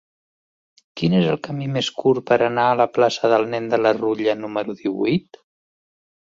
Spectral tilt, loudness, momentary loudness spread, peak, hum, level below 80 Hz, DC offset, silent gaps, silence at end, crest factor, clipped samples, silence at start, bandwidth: -6 dB/octave; -20 LUFS; 8 LU; -4 dBFS; none; -60 dBFS; under 0.1%; none; 1.1 s; 18 dB; under 0.1%; 0.95 s; 7.8 kHz